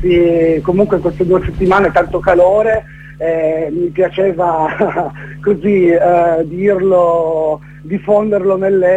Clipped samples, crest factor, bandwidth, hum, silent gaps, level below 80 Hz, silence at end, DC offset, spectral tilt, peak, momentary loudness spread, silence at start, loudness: under 0.1%; 12 dB; 8 kHz; none; none; -36 dBFS; 0 s; under 0.1%; -8.5 dB/octave; 0 dBFS; 8 LU; 0 s; -13 LUFS